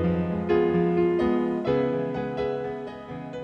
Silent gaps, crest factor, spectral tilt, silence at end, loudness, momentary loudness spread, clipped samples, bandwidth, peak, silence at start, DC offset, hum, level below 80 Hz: none; 14 dB; -9 dB/octave; 0 s; -25 LUFS; 13 LU; under 0.1%; 6.2 kHz; -12 dBFS; 0 s; under 0.1%; none; -50 dBFS